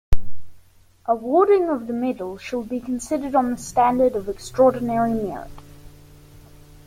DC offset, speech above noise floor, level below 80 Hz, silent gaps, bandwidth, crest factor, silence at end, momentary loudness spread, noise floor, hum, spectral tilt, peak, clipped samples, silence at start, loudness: under 0.1%; 31 dB; -34 dBFS; none; 16 kHz; 18 dB; 0.45 s; 13 LU; -51 dBFS; none; -6.5 dB/octave; -2 dBFS; under 0.1%; 0.1 s; -22 LUFS